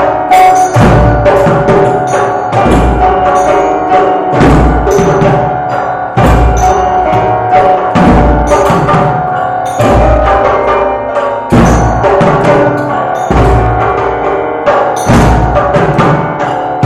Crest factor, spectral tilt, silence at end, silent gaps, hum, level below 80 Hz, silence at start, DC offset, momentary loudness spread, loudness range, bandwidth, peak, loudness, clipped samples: 8 dB; -6.5 dB/octave; 0 s; none; none; -18 dBFS; 0 s; under 0.1%; 6 LU; 1 LU; 14.5 kHz; 0 dBFS; -8 LUFS; 0.6%